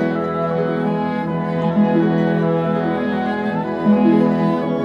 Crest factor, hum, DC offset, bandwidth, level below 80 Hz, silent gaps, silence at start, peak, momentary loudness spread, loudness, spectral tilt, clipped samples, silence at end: 14 dB; none; under 0.1%; 5.8 kHz; -52 dBFS; none; 0 s; -4 dBFS; 6 LU; -18 LUFS; -9.5 dB/octave; under 0.1%; 0 s